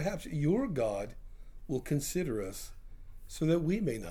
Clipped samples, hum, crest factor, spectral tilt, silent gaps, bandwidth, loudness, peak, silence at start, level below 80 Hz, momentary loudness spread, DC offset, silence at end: under 0.1%; none; 16 dB; -6.5 dB/octave; none; 17.5 kHz; -33 LUFS; -18 dBFS; 0 s; -48 dBFS; 15 LU; under 0.1%; 0 s